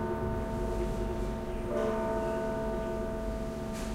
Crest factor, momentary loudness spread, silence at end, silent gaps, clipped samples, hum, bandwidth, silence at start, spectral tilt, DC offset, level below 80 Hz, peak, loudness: 12 dB; 5 LU; 0 s; none; under 0.1%; none; 16 kHz; 0 s; -7 dB/octave; under 0.1%; -40 dBFS; -20 dBFS; -34 LUFS